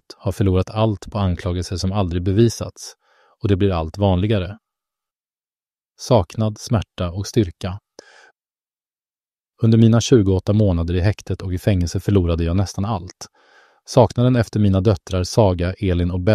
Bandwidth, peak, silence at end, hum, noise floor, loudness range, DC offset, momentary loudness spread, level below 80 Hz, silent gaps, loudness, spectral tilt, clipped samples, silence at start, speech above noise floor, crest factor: 13.5 kHz; 0 dBFS; 0 s; none; under -90 dBFS; 5 LU; under 0.1%; 12 LU; -38 dBFS; none; -19 LUFS; -7 dB/octave; under 0.1%; 0.25 s; over 72 dB; 18 dB